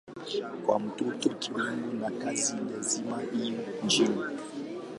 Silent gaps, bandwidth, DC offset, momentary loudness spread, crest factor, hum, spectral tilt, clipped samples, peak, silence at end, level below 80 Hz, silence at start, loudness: none; 11.5 kHz; under 0.1%; 9 LU; 20 dB; none; -3 dB/octave; under 0.1%; -10 dBFS; 0 s; -76 dBFS; 0.05 s; -31 LUFS